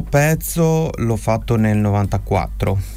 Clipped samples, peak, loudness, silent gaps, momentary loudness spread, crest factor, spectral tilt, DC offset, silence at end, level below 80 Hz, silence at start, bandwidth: under 0.1%; -4 dBFS; -18 LUFS; none; 5 LU; 12 dB; -6.5 dB/octave; under 0.1%; 0 s; -30 dBFS; 0 s; 16 kHz